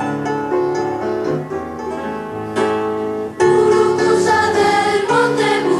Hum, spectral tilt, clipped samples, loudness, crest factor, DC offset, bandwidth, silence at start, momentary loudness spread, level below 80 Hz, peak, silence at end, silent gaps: none; -5 dB/octave; under 0.1%; -17 LUFS; 14 dB; under 0.1%; 12.5 kHz; 0 s; 11 LU; -52 dBFS; -2 dBFS; 0 s; none